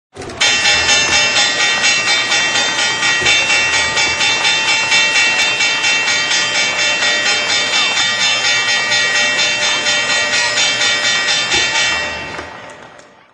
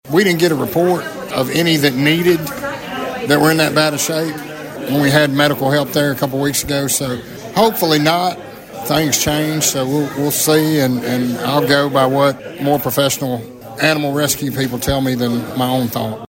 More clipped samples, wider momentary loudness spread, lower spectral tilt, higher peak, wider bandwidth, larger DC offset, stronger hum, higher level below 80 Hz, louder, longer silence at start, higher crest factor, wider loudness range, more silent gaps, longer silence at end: neither; second, 3 LU vs 10 LU; second, 0.5 dB/octave vs -4 dB/octave; about the same, 0 dBFS vs 0 dBFS; second, 14 kHz vs 16.5 kHz; neither; neither; about the same, -48 dBFS vs -44 dBFS; first, -11 LUFS vs -16 LUFS; about the same, 0.15 s vs 0.05 s; about the same, 14 dB vs 16 dB; about the same, 1 LU vs 2 LU; neither; first, 0.35 s vs 0.15 s